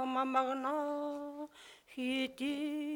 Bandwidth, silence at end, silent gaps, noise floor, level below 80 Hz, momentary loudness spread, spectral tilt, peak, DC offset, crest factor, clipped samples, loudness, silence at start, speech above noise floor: 18 kHz; 0 s; none; -57 dBFS; -78 dBFS; 16 LU; -3 dB/octave; -20 dBFS; under 0.1%; 18 dB; under 0.1%; -36 LUFS; 0 s; 22 dB